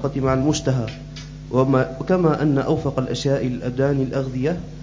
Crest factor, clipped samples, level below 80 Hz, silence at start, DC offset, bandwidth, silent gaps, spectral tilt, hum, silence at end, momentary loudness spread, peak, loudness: 16 dB; under 0.1%; -40 dBFS; 0 s; under 0.1%; 7.6 kHz; none; -7 dB/octave; none; 0 s; 7 LU; -4 dBFS; -21 LUFS